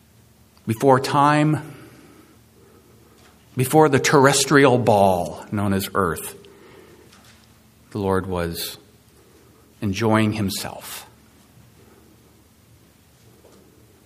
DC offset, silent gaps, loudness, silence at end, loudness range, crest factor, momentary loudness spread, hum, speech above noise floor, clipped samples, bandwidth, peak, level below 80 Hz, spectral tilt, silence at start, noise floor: under 0.1%; none; -19 LUFS; 3 s; 12 LU; 22 dB; 19 LU; none; 35 dB; under 0.1%; 15.5 kHz; 0 dBFS; -54 dBFS; -5 dB/octave; 0.65 s; -53 dBFS